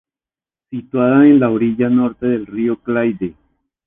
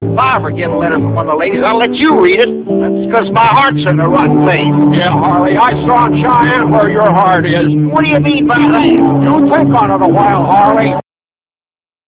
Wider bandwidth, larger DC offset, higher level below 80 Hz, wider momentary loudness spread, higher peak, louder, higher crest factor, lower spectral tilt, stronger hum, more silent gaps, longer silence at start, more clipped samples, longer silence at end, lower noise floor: about the same, 3.8 kHz vs 4 kHz; neither; second, -52 dBFS vs -40 dBFS; first, 16 LU vs 5 LU; about the same, -2 dBFS vs 0 dBFS; second, -15 LUFS vs -9 LUFS; first, 16 dB vs 10 dB; about the same, -11 dB/octave vs -10.5 dB/octave; neither; neither; first, 0.7 s vs 0 s; second, under 0.1% vs 0.4%; second, 0.55 s vs 1.05 s; about the same, under -90 dBFS vs under -90 dBFS